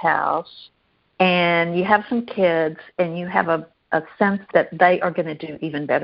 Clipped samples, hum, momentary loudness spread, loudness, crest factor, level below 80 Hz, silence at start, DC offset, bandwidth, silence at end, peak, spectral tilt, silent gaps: under 0.1%; none; 10 LU; -20 LUFS; 20 dB; -62 dBFS; 0 s; under 0.1%; 5.6 kHz; 0 s; -2 dBFS; -3.5 dB/octave; none